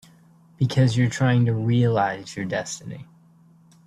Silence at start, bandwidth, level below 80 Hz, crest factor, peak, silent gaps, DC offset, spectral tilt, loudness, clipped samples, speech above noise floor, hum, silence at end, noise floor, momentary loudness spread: 0.6 s; 11 kHz; -56 dBFS; 16 dB; -8 dBFS; none; under 0.1%; -6.5 dB/octave; -22 LUFS; under 0.1%; 32 dB; none; 0.85 s; -54 dBFS; 13 LU